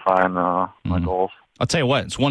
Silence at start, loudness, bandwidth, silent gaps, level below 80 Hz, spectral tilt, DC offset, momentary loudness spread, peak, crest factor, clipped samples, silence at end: 0 s; -21 LUFS; 11 kHz; none; -42 dBFS; -5.5 dB/octave; under 0.1%; 6 LU; -2 dBFS; 18 dB; under 0.1%; 0 s